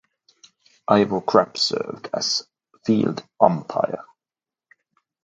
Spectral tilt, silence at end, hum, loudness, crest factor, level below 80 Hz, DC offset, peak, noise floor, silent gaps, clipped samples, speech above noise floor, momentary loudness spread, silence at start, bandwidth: -4.5 dB/octave; 1.25 s; none; -21 LUFS; 24 dB; -64 dBFS; under 0.1%; 0 dBFS; under -90 dBFS; none; under 0.1%; over 69 dB; 10 LU; 0.9 s; 9.2 kHz